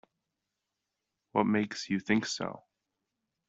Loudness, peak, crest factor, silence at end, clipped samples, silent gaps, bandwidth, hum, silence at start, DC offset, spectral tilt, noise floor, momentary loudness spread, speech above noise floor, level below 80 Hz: -31 LUFS; -12 dBFS; 24 dB; 0.9 s; under 0.1%; none; 8 kHz; none; 1.35 s; under 0.1%; -5 dB/octave; -86 dBFS; 10 LU; 56 dB; -72 dBFS